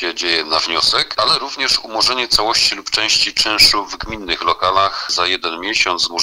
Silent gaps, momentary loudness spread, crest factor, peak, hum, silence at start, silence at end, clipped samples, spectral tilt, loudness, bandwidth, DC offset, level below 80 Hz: none; 8 LU; 16 dB; 0 dBFS; none; 0 s; 0 s; under 0.1%; -0.5 dB/octave; -14 LUFS; 16 kHz; under 0.1%; -42 dBFS